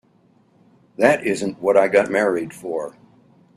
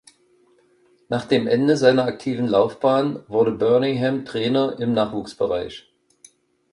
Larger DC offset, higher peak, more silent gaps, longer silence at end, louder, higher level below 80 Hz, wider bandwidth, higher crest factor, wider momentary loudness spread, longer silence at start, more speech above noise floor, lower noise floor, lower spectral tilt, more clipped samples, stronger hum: neither; about the same, 0 dBFS vs -2 dBFS; neither; second, 0.65 s vs 0.95 s; about the same, -19 LUFS vs -20 LUFS; about the same, -62 dBFS vs -58 dBFS; first, 13.5 kHz vs 11 kHz; about the same, 20 dB vs 20 dB; first, 12 LU vs 9 LU; about the same, 1 s vs 1.1 s; about the same, 39 dB vs 39 dB; about the same, -57 dBFS vs -59 dBFS; second, -5 dB/octave vs -6.5 dB/octave; neither; neither